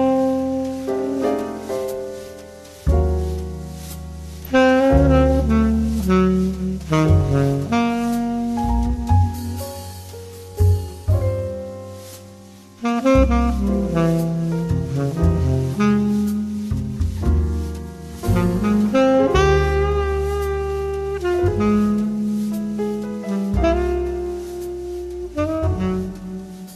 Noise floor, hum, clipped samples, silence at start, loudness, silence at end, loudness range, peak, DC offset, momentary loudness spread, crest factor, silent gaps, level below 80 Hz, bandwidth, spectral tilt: -42 dBFS; none; under 0.1%; 0 s; -20 LUFS; 0 s; 6 LU; -4 dBFS; under 0.1%; 16 LU; 16 dB; none; -28 dBFS; 14 kHz; -7.5 dB/octave